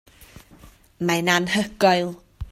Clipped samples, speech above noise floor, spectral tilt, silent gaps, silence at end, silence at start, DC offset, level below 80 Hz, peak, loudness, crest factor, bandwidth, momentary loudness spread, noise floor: under 0.1%; 29 dB; -4 dB/octave; none; 0 s; 0.35 s; under 0.1%; -46 dBFS; -4 dBFS; -21 LUFS; 20 dB; 16 kHz; 11 LU; -50 dBFS